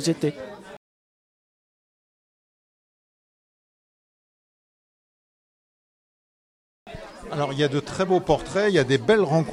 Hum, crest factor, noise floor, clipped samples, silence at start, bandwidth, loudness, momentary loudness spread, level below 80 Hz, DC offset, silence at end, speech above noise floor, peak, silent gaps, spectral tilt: none; 22 dB; under -90 dBFS; under 0.1%; 0 s; 13.5 kHz; -23 LUFS; 21 LU; -52 dBFS; under 0.1%; 0 s; over 68 dB; -6 dBFS; 0.77-6.86 s; -5.5 dB/octave